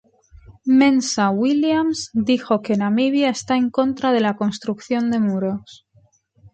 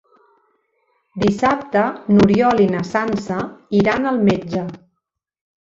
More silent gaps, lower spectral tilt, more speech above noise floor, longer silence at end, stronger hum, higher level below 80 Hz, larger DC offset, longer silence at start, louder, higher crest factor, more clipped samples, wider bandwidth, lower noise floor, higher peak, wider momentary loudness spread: neither; second, -5 dB/octave vs -7 dB/octave; second, 39 dB vs 60 dB; about the same, 0.8 s vs 0.85 s; neither; second, -56 dBFS vs -48 dBFS; neither; second, 0.5 s vs 1.15 s; about the same, -19 LUFS vs -17 LUFS; about the same, 14 dB vs 16 dB; neither; first, 9 kHz vs 7.6 kHz; second, -58 dBFS vs -77 dBFS; about the same, -4 dBFS vs -2 dBFS; second, 8 LU vs 12 LU